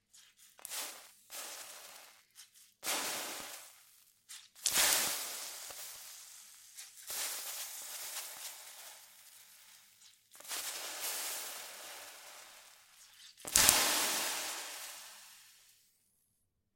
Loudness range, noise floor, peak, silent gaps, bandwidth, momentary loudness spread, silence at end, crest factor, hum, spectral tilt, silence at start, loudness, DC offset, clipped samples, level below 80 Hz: 11 LU; -80 dBFS; -2 dBFS; none; 17 kHz; 27 LU; 1.2 s; 38 dB; none; 1 dB/octave; 0.15 s; -34 LUFS; under 0.1%; under 0.1%; -68 dBFS